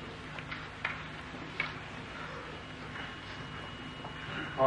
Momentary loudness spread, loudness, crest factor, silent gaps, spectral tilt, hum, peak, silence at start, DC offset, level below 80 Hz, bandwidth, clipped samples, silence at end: 6 LU; -41 LUFS; 28 dB; none; -5 dB/octave; none; -12 dBFS; 0 s; under 0.1%; -58 dBFS; 11.5 kHz; under 0.1%; 0 s